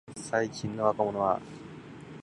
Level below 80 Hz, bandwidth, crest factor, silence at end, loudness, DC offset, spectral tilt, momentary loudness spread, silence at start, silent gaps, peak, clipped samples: -64 dBFS; 11.5 kHz; 22 dB; 0 s; -30 LUFS; under 0.1%; -5.5 dB/octave; 18 LU; 0.05 s; none; -10 dBFS; under 0.1%